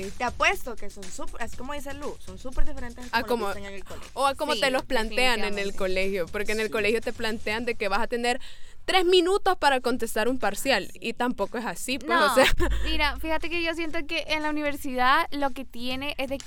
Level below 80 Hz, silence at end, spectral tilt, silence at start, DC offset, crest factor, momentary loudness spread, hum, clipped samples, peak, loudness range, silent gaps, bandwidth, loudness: -36 dBFS; 0 s; -3.5 dB/octave; 0 s; under 0.1%; 18 dB; 15 LU; none; under 0.1%; -8 dBFS; 6 LU; none; 17.5 kHz; -26 LUFS